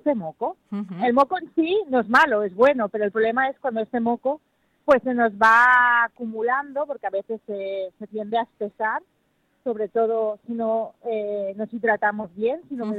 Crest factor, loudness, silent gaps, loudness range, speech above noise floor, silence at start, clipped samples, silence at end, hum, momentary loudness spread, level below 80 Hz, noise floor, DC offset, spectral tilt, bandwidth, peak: 18 dB; -22 LUFS; none; 8 LU; 45 dB; 0.05 s; under 0.1%; 0 s; none; 13 LU; -64 dBFS; -68 dBFS; under 0.1%; -6 dB/octave; 11.5 kHz; -6 dBFS